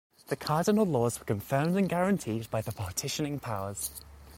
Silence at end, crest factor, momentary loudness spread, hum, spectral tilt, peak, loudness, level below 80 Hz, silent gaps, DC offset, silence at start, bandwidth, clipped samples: 0 s; 16 dB; 10 LU; none; -5.5 dB/octave; -14 dBFS; -30 LUFS; -58 dBFS; none; under 0.1%; 0.3 s; 16.5 kHz; under 0.1%